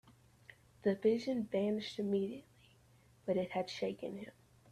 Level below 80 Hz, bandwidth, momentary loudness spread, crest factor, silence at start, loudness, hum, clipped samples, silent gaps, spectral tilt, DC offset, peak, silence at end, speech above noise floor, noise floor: -74 dBFS; 13 kHz; 13 LU; 18 dB; 0.05 s; -37 LUFS; none; under 0.1%; none; -6.5 dB/octave; under 0.1%; -20 dBFS; 0.4 s; 30 dB; -66 dBFS